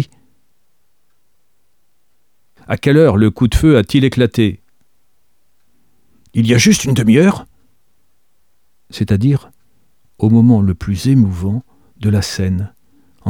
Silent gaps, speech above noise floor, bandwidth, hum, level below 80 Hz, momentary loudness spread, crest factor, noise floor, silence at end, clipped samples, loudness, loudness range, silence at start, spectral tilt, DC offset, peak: none; 55 dB; 17.5 kHz; none; -34 dBFS; 13 LU; 14 dB; -67 dBFS; 0 s; under 0.1%; -14 LUFS; 3 LU; 0 s; -6 dB/octave; 0.3%; 0 dBFS